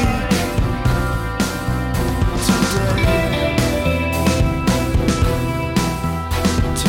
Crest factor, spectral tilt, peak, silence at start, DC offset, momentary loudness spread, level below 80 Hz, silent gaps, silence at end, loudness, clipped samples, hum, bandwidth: 14 dB; -5.5 dB/octave; -2 dBFS; 0 s; under 0.1%; 4 LU; -24 dBFS; none; 0 s; -18 LUFS; under 0.1%; none; 17 kHz